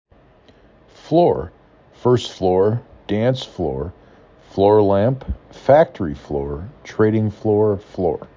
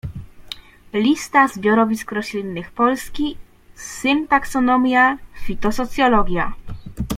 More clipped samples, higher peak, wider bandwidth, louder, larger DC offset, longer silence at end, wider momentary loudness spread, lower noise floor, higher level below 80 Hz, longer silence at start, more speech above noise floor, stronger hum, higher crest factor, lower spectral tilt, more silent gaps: neither; about the same, -2 dBFS vs -2 dBFS; second, 7.6 kHz vs 16 kHz; about the same, -19 LUFS vs -19 LUFS; neither; about the same, 0.1 s vs 0 s; second, 14 LU vs 19 LU; first, -51 dBFS vs -38 dBFS; about the same, -40 dBFS vs -36 dBFS; first, 1.05 s vs 0.05 s; first, 33 dB vs 20 dB; neither; about the same, 18 dB vs 18 dB; first, -8 dB/octave vs -5 dB/octave; neither